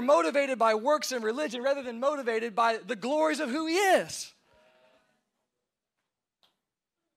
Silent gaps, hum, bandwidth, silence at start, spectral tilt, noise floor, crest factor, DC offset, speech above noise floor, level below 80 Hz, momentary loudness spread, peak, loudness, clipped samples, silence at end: none; none; 16 kHz; 0 s; -2.5 dB/octave; -87 dBFS; 18 dB; under 0.1%; 60 dB; -82 dBFS; 7 LU; -12 dBFS; -28 LUFS; under 0.1%; 2.85 s